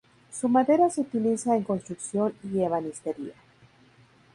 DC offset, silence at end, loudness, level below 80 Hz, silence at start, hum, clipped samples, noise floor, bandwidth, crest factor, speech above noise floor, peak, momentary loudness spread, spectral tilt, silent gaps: under 0.1%; 1 s; -26 LUFS; -68 dBFS; 0.3 s; none; under 0.1%; -58 dBFS; 11.5 kHz; 18 dB; 32 dB; -10 dBFS; 13 LU; -6.5 dB/octave; none